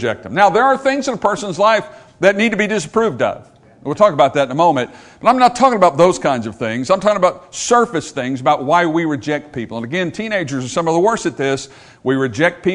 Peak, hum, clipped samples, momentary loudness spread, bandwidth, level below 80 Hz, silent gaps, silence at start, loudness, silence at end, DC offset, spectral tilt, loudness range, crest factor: 0 dBFS; none; under 0.1%; 10 LU; 11 kHz; -54 dBFS; none; 0 s; -16 LUFS; 0 s; under 0.1%; -5 dB/octave; 4 LU; 16 dB